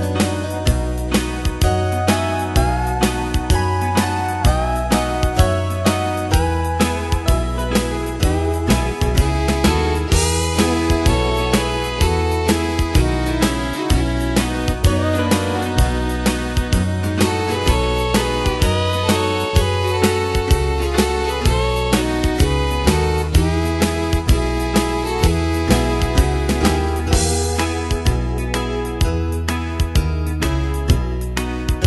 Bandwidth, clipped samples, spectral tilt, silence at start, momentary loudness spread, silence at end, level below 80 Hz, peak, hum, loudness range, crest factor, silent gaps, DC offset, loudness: 12.5 kHz; under 0.1%; -5 dB/octave; 0 s; 3 LU; 0 s; -22 dBFS; 0 dBFS; none; 2 LU; 16 dB; none; under 0.1%; -18 LUFS